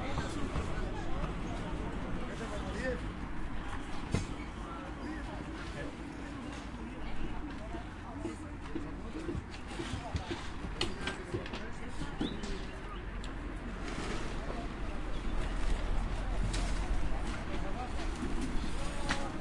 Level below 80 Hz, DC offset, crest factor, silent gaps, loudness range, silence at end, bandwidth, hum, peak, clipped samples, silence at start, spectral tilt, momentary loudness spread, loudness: -40 dBFS; under 0.1%; 20 dB; none; 4 LU; 0 s; 11.5 kHz; none; -16 dBFS; under 0.1%; 0 s; -5.5 dB/octave; 6 LU; -40 LUFS